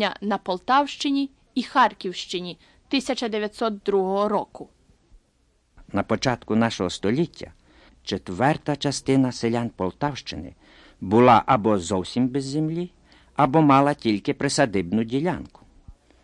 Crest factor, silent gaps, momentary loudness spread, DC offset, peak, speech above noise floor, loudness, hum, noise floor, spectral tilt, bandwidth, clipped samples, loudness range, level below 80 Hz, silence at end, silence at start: 20 dB; none; 14 LU; under 0.1%; -4 dBFS; 42 dB; -23 LUFS; none; -65 dBFS; -5.5 dB/octave; 11.5 kHz; under 0.1%; 6 LU; -54 dBFS; 0.3 s; 0 s